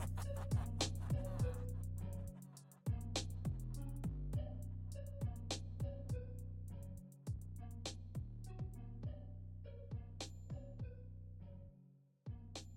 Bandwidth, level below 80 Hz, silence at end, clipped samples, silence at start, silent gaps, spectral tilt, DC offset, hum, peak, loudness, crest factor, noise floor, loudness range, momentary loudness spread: 16.5 kHz; -52 dBFS; 0 s; under 0.1%; 0 s; none; -5.5 dB/octave; under 0.1%; none; -26 dBFS; -47 LUFS; 20 dB; -67 dBFS; 8 LU; 12 LU